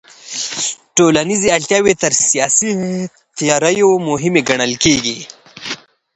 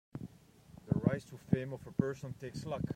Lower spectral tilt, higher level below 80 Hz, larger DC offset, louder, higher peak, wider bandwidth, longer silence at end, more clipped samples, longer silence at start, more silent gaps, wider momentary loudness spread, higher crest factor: second, -3 dB/octave vs -8 dB/octave; first, -48 dBFS vs -60 dBFS; neither; first, -14 LUFS vs -37 LUFS; first, 0 dBFS vs -14 dBFS; second, 9 kHz vs 15.5 kHz; first, 0.4 s vs 0 s; neither; about the same, 0.25 s vs 0.15 s; neither; about the same, 14 LU vs 16 LU; second, 16 dB vs 24 dB